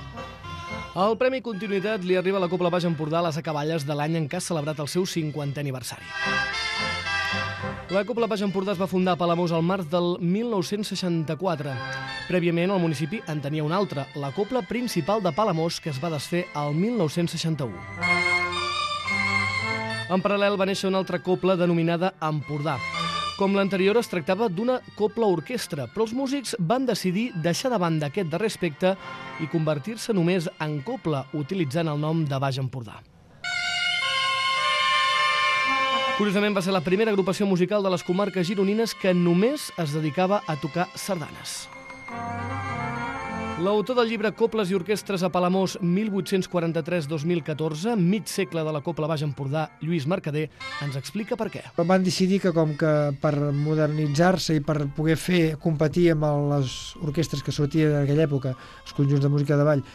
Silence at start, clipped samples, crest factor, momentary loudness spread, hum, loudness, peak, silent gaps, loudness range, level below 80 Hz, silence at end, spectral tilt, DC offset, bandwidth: 0 s; under 0.1%; 16 dB; 9 LU; none; -25 LUFS; -8 dBFS; none; 4 LU; -54 dBFS; 0 s; -5.5 dB/octave; under 0.1%; 13 kHz